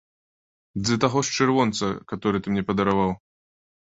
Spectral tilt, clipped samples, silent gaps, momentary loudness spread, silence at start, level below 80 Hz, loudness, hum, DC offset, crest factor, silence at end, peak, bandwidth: -5 dB/octave; under 0.1%; none; 8 LU; 0.75 s; -52 dBFS; -23 LUFS; none; under 0.1%; 22 dB; 0.7 s; -4 dBFS; 8 kHz